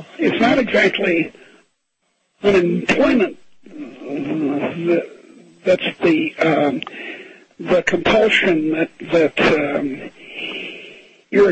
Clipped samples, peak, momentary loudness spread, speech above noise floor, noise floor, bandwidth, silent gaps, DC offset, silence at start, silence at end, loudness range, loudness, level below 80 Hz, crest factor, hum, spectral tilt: under 0.1%; 0 dBFS; 17 LU; 52 dB; -69 dBFS; 8.6 kHz; none; under 0.1%; 0 s; 0 s; 3 LU; -18 LUFS; -52 dBFS; 18 dB; none; -5.5 dB/octave